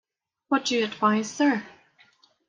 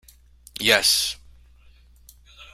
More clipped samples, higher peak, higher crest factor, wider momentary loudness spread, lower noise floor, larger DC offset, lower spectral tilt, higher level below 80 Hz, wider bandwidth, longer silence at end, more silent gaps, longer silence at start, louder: neither; second, -8 dBFS vs 0 dBFS; second, 18 dB vs 26 dB; second, 4 LU vs 23 LU; first, -60 dBFS vs -52 dBFS; neither; first, -4 dB/octave vs -0.5 dB/octave; second, -76 dBFS vs -52 dBFS; second, 9.6 kHz vs 16 kHz; first, 0.8 s vs 0.1 s; neither; about the same, 0.5 s vs 0.55 s; second, -25 LUFS vs -19 LUFS